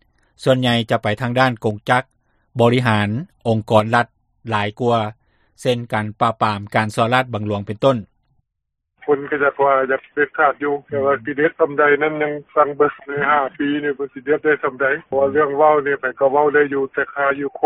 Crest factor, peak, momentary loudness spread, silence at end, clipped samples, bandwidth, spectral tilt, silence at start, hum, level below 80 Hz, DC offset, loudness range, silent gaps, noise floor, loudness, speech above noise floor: 18 dB; 0 dBFS; 8 LU; 0 s; under 0.1%; 12.5 kHz; -6.5 dB/octave; 0.4 s; none; -56 dBFS; under 0.1%; 3 LU; none; -77 dBFS; -18 LUFS; 59 dB